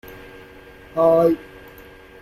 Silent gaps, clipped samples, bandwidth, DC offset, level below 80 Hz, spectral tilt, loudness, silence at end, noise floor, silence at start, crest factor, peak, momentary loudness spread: none; under 0.1%; 15 kHz; under 0.1%; -52 dBFS; -8 dB/octave; -18 LUFS; 0.8 s; -44 dBFS; 0.1 s; 18 dB; -4 dBFS; 26 LU